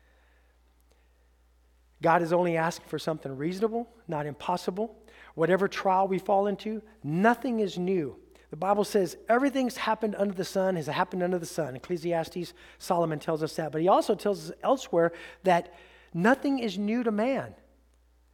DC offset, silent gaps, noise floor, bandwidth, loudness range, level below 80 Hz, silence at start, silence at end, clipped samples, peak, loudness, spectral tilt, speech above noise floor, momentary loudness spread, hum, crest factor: under 0.1%; none; -63 dBFS; 17.5 kHz; 3 LU; -62 dBFS; 2 s; 0.8 s; under 0.1%; -8 dBFS; -28 LUFS; -6 dB/octave; 35 dB; 11 LU; none; 20 dB